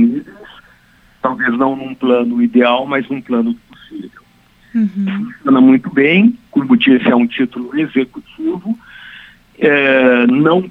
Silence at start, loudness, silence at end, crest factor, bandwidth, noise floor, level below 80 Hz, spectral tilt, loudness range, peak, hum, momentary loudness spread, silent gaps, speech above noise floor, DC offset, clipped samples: 0 s; -14 LUFS; 0 s; 14 dB; 4.1 kHz; -49 dBFS; -56 dBFS; -8 dB/octave; 4 LU; 0 dBFS; none; 15 LU; none; 37 dB; under 0.1%; under 0.1%